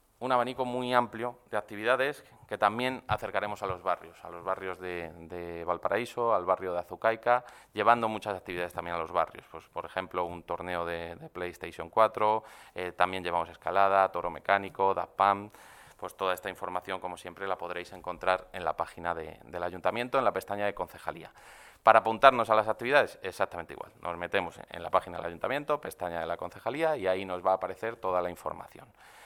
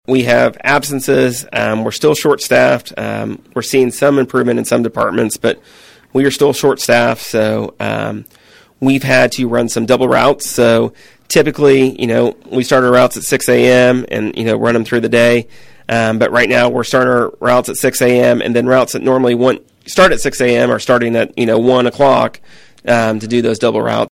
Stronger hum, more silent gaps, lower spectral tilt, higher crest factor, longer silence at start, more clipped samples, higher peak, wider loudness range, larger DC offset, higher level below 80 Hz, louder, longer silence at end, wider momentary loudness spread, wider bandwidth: neither; neither; about the same, -5 dB/octave vs -4.5 dB/octave; first, 28 dB vs 12 dB; about the same, 0.2 s vs 0.1 s; neither; about the same, -2 dBFS vs 0 dBFS; first, 8 LU vs 3 LU; neither; second, -62 dBFS vs -46 dBFS; second, -30 LUFS vs -13 LUFS; about the same, 0 s vs 0.05 s; first, 14 LU vs 8 LU; about the same, 16.5 kHz vs 16.5 kHz